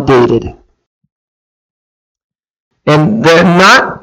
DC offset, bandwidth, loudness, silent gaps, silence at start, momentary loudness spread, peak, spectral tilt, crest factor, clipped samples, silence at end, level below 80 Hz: under 0.1%; 16.5 kHz; -7 LUFS; 0.87-1.01 s, 1.12-2.15 s, 2.24-2.30 s, 2.50-2.54 s, 2.60-2.71 s; 0 s; 12 LU; 0 dBFS; -5.5 dB/octave; 10 dB; 0.2%; 0.05 s; -40 dBFS